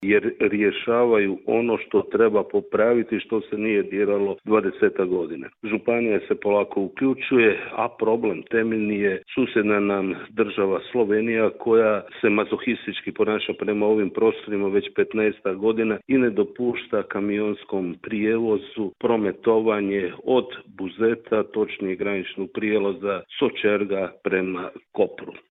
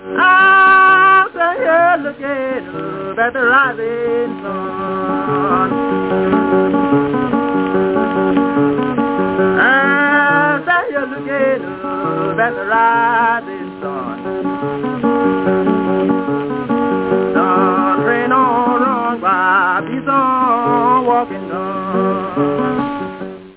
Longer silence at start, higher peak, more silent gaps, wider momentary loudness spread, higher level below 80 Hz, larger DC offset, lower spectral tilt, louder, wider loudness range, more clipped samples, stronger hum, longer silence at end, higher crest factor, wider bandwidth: about the same, 0 s vs 0 s; second, -6 dBFS vs -2 dBFS; neither; second, 7 LU vs 11 LU; second, -62 dBFS vs -50 dBFS; neither; second, -4.5 dB/octave vs -9.5 dB/octave; second, -23 LUFS vs -14 LUFS; about the same, 3 LU vs 3 LU; neither; neither; about the same, 0.1 s vs 0.05 s; first, 18 dB vs 12 dB; about the same, 4 kHz vs 4 kHz